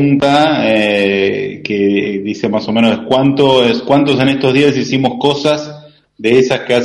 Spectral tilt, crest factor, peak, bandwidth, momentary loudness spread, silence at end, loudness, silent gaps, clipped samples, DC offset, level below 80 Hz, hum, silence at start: -6 dB/octave; 12 dB; 0 dBFS; 11.5 kHz; 7 LU; 0 s; -12 LUFS; none; under 0.1%; under 0.1%; -50 dBFS; none; 0 s